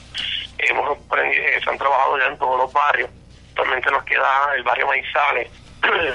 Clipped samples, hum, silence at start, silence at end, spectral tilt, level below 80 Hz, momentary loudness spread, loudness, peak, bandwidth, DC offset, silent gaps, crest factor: under 0.1%; none; 0 s; 0 s; -3 dB/octave; -50 dBFS; 7 LU; -19 LUFS; -2 dBFS; 11 kHz; under 0.1%; none; 18 dB